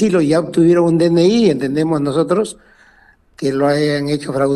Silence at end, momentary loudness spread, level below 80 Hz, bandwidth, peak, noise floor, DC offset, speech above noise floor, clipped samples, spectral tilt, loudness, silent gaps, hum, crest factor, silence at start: 0 s; 7 LU; -50 dBFS; 12 kHz; -2 dBFS; -50 dBFS; under 0.1%; 36 dB; under 0.1%; -6.5 dB/octave; -15 LUFS; none; none; 14 dB; 0 s